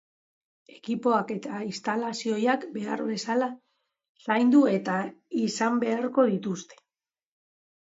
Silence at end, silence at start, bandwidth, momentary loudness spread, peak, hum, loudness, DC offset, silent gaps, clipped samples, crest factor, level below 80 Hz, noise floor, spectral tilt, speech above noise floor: 1.1 s; 0.85 s; 8 kHz; 12 LU; -10 dBFS; none; -27 LUFS; under 0.1%; 4.09-4.15 s; under 0.1%; 18 dB; -78 dBFS; -90 dBFS; -5.5 dB/octave; 64 dB